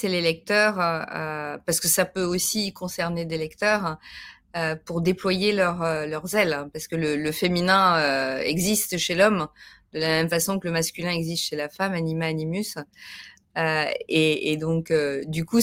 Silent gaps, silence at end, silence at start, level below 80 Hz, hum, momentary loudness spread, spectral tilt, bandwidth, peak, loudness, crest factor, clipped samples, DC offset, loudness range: none; 0 s; 0 s; -56 dBFS; none; 10 LU; -4 dB/octave; 16.5 kHz; -6 dBFS; -24 LUFS; 20 dB; under 0.1%; under 0.1%; 4 LU